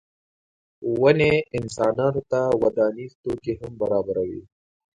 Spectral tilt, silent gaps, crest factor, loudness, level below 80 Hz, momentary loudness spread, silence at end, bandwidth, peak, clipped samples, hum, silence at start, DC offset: -6.5 dB/octave; 3.15-3.24 s; 20 dB; -23 LUFS; -52 dBFS; 12 LU; 0.55 s; 10 kHz; -2 dBFS; under 0.1%; none; 0.8 s; under 0.1%